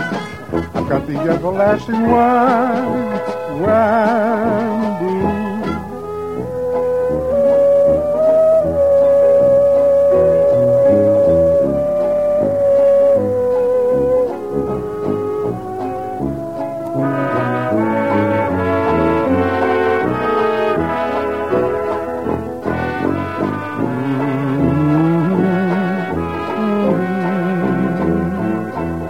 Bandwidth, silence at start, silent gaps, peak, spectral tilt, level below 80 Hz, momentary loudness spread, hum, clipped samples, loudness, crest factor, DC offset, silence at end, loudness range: 12.5 kHz; 0 s; none; -2 dBFS; -8.5 dB/octave; -42 dBFS; 10 LU; none; under 0.1%; -16 LUFS; 14 dB; 0.5%; 0 s; 7 LU